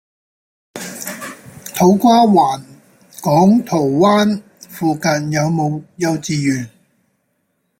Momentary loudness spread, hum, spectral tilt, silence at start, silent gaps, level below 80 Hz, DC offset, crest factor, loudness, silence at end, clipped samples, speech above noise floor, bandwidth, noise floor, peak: 19 LU; none; -6 dB/octave; 0.75 s; none; -56 dBFS; under 0.1%; 14 dB; -15 LUFS; 1.1 s; under 0.1%; 53 dB; 16.5 kHz; -67 dBFS; -2 dBFS